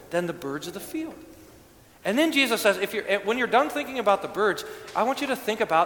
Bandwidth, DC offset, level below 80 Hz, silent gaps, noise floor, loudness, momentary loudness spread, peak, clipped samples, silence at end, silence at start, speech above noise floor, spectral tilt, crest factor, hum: 19 kHz; under 0.1%; -62 dBFS; none; -52 dBFS; -25 LUFS; 12 LU; -6 dBFS; under 0.1%; 0 s; 0 s; 27 dB; -3.5 dB/octave; 20 dB; none